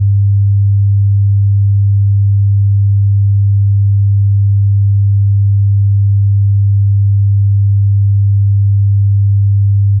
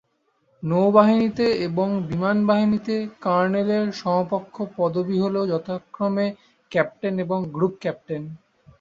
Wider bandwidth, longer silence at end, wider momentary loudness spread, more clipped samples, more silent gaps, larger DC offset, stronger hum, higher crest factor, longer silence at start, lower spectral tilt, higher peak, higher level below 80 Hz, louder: second, 0.2 kHz vs 7.4 kHz; second, 0 s vs 0.45 s; second, 0 LU vs 10 LU; neither; neither; neither; neither; second, 4 dB vs 20 dB; second, 0 s vs 0.6 s; first, -19.5 dB/octave vs -8 dB/octave; second, -6 dBFS vs -2 dBFS; first, -38 dBFS vs -60 dBFS; first, -11 LUFS vs -22 LUFS